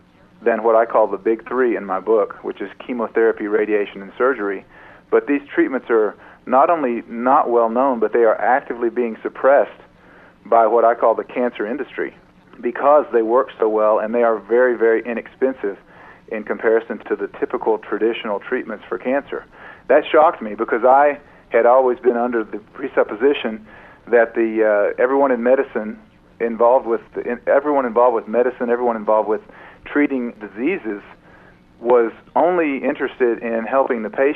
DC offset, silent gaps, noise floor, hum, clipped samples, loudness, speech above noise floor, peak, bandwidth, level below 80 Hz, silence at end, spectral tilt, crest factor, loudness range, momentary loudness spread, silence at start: under 0.1%; none; -47 dBFS; none; under 0.1%; -18 LUFS; 30 dB; -2 dBFS; 4 kHz; -58 dBFS; 0 s; -8 dB/octave; 16 dB; 4 LU; 12 LU; 0.4 s